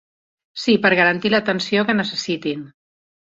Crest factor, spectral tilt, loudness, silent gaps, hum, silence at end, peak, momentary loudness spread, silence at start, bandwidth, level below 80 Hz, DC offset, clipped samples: 18 dB; -5 dB/octave; -18 LUFS; none; none; 0.65 s; -2 dBFS; 12 LU; 0.55 s; 7.8 kHz; -60 dBFS; under 0.1%; under 0.1%